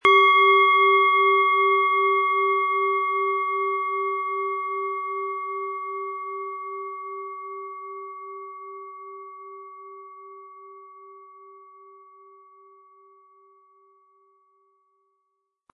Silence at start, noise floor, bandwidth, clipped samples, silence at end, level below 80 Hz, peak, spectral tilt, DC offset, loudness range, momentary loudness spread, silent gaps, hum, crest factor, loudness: 0.05 s; -77 dBFS; 6.4 kHz; under 0.1%; 4.2 s; -78 dBFS; -4 dBFS; -3 dB/octave; under 0.1%; 24 LU; 25 LU; none; none; 22 dB; -21 LUFS